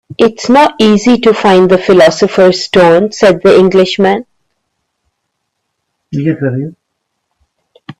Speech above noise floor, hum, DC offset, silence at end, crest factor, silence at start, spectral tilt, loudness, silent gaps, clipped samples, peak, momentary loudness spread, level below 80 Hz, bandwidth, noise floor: 62 dB; none; under 0.1%; 0.1 s; 10 dB; 0.1 s; -5.5 dB/octave; -8 LUFS; none; under 0.1%; 0 dBFS; 10 LU; -48 dBFS; 11.5 kHz; -69 dBFS